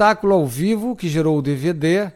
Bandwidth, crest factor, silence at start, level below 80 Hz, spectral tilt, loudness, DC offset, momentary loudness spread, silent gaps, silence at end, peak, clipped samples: 17 kHz; 14 dB; 0 s; -50 dBFS; -6.5 dB/octave; -19 LUFS; under 0.1%; 5 LU; none; 0.05 s; -4 dBFS; under 0.1%